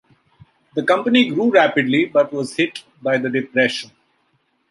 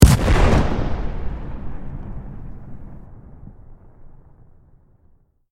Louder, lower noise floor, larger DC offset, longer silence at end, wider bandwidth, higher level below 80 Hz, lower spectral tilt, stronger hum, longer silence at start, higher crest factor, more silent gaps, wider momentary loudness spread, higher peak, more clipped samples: first, -18 LUFS vs -21 LUFS; first, -65 dBFS vs -55 dBFS; neither; second, 0.85 s vs 1.45 s; second, 11.5 kHz vs 16.5 kHz; second, -68 dBFS vs -24 dBFS; about the same, -5 dB/octave vs -6 dB/octave; neither; first, 0.75 s vs 0 s; about the same, 18 dB vs 20 dB; neither; second, 11 LU vs 27 LU; about the same, -2 dBFS vs 0 dBFS; neither